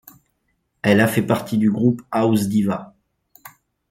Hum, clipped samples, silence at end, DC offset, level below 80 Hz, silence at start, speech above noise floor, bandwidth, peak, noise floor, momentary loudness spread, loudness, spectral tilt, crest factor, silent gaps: none; under 0.1%; 0.4 s; under 0.1%; -58 dBFS; 0.85 s; 52 dB; 16.5 kHz; -2 dBFS; -70 dBFS; 7 LU; -19 LUFS; -6.5 dB/octave; 18 dB; none